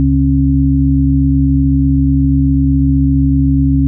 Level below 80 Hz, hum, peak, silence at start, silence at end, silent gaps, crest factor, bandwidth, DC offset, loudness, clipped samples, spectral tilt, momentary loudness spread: -16 dBFS; none; -4 dBFS; 0 s; 0 s; none; 6 dB; 0.4 kHz; under 0.1%; -12 LUFS; under 0.1%; -27.5 dB/octave; 0 LU